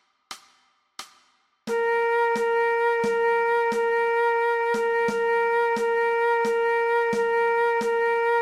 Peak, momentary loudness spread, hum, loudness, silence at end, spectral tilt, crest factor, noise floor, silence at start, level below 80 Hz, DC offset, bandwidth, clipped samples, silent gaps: -14 dBFS; 14 LU; none; -23 LUFS; 0 s; -3.5 dB/octave; 10 dB; -64 dBFS; 0.3 s; -72 dBFS; under 0.1%; 12.5 kHz; under 0.1%; none